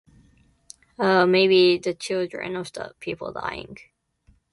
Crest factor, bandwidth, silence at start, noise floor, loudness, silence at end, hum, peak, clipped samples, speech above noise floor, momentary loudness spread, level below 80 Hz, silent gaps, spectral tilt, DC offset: 18 dB; 11.5 kHz; 1 s; -61 dBFS; -22 LUFS; 0.8 s; none; -6 dBFS; under 0.1%; 39 dB; 17 LU; -60 dBFS; none; -5 dB/octave; under 0.1%